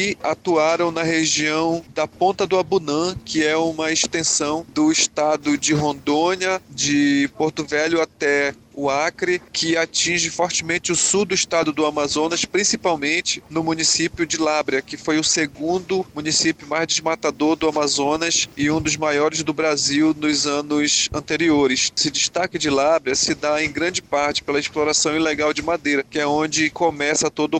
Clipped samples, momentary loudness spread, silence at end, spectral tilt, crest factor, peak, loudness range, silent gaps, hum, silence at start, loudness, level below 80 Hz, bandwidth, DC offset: under 0.1%; 5 LU; 0 s; -2.5 dB/octave; 16 dB; -4 dBFS; 2 LU; none; none; 0 s; -19 LUFS; -52 dBFS; 9.6 kHz; under 0.1%